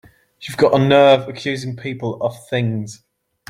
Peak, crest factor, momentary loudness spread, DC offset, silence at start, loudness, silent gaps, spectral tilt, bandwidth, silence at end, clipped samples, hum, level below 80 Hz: 0 dBFS; 18 dB; 16 LU; under 0.1%; 0.4 s; -17 LUFS; none; -6 dB/octave; 14.5 kHz; 0.55 s; under 0.1%; none; -56 dBFS